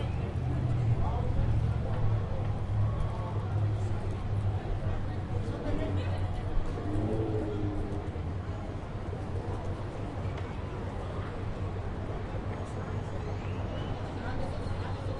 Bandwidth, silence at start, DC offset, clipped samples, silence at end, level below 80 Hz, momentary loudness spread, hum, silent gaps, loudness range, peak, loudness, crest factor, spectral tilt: 10 kHz; 0 s; under 0.1%; under 0.1%; 0 s; -38 dBFS; 7 LU; none; none; 6 LU; -16 dBFS; -34 LUFS; 16 dB; -8.5 dB/octave